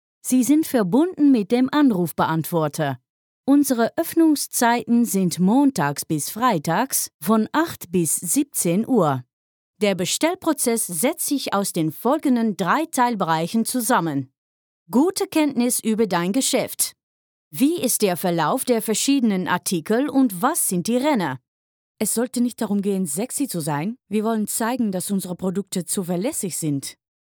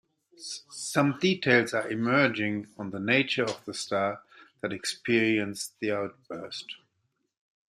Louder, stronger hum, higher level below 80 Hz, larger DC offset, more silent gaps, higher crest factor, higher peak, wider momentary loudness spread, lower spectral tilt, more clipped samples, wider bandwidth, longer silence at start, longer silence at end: first, -21 LUFS vs -28 LUFS; neither; about the same, -70 dBFS vs -72 dBFS; neither; first, 3.10-3.44 s, 7.14-7.19 s, 9.33-9.74 s, 14.38-14.86 s, 17.03-17.51 s, 21.48-21.95 s vs none; second, 16 dB vs 24 dB; about the same, -6 dBFS vs -6 dBFS; second, 7 LU vs 15 LU; about the same, -4.5 dB/octave vs -4.5 dB/octave; neither; first, over 20 kHz vs 15 kHz; second, 0.25 s vs 0.4 s; second, 0.45 s vs 0.9 s